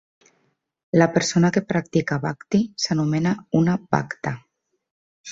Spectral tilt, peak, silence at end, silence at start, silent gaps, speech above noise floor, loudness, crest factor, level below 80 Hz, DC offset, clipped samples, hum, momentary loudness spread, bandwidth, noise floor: -5.5 dB/octave; -4 dBFS; 0 s; 0.95 s; 4.91-5.24 s; 48 dB; -22 LUFS; 20 dB; -58 dBFS; under 0.1%; under 0.1%; none; 10 LU; 7.8 kHz; -69 dBFS